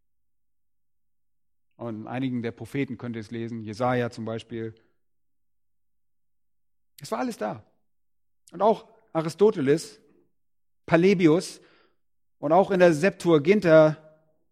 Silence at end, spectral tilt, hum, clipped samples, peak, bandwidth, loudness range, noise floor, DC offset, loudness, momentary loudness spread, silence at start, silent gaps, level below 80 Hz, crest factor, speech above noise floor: 0.55 s; -6.5 dB/octave; none; under 0.1%; -4 dBFS; 14.5 kHz; 15 LU; -89 dBFS; under 0.1%; -24 LUFS; 18 LU; 1.8 s; none; -66 dBFS; 22 dB; 65 dB